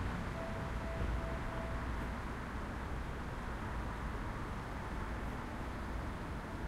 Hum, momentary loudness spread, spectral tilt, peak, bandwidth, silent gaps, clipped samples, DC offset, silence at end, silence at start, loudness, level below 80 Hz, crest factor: none; 3 LU; -6.5 dB/octave; -26 dBFS; 15 kHz; none; under 0.1%; under 0.1%; 0 s; 0 s; -42 LUFS; -44 dBFS; 14 dB